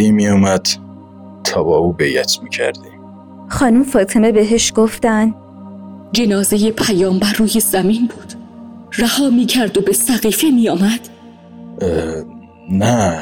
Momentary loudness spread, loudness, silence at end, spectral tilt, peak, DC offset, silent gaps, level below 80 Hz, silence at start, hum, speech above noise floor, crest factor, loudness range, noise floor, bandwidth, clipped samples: 18 LU; -14 LUFS; 0 s; -4.5 dB/octave; -4 dBFS; under 0.1%; none; -42 dBFS; 0 s; none; 24 dB; 12 dB; 2 LU; -38 dBFS; 18 kHz; under 0.1%